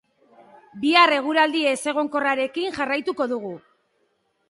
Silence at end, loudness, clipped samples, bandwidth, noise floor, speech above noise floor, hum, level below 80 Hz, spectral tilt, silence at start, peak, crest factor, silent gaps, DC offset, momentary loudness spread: 0.9 s; -21 LUFS; under 0.1%; 11.5 kHz; -69 dBFS; 48 dB; none; -68 dBFS; -3 dB/octave; 0.75 s; -4 dBFS; 20 dB; none; under 0.1%; 11 LU